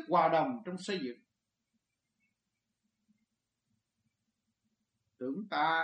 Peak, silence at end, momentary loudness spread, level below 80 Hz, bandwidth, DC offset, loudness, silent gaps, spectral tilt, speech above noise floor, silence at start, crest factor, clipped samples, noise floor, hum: -16 dBFS; 0 s; 14 LU; -88 dBFS; 9 kHz; under 0.1%; -33 LUFS; none; -5.5 dB/octave; 55 dB; 0 s; 22 dB; under 0.1%; -87 dBFS; none